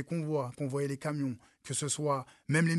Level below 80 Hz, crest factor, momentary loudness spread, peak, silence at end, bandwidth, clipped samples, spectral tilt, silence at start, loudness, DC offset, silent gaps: -72 dBFS; 16 dB; 5 LU; -16 dBFS; 0 s; 12.5 kHz; under 0.1%; -5 dB/octave; 0 s; -34 LUFS; under 0.1%; none